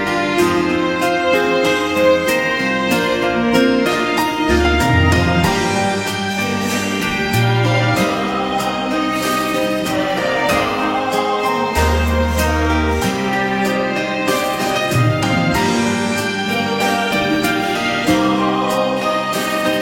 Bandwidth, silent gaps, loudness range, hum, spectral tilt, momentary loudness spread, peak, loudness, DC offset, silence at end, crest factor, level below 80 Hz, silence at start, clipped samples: 16.5 kHz; none; 2 LU; none; -5 dB/octave; 4 LU; 0 dBFS; -16 LUFS; under 0.1%; 0 s; 16 dB; -30 dBFS; 0 s; under 0.1%